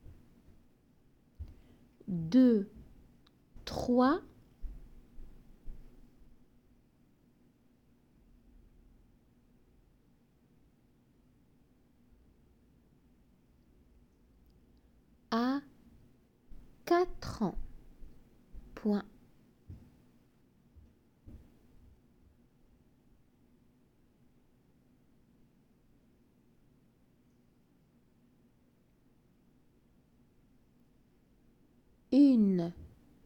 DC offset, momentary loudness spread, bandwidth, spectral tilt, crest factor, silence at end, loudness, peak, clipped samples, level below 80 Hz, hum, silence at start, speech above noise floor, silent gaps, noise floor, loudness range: under 0.1%; 32 LU; 16.5 kHz; -7.5 dB/octave; 24 dB; 0.4 s; -31 LUFS; -16 dBFS; under 0.1%; -56 dBFS; none; 1.4 s; 41 dB; none; -68 dBFS; 11 LU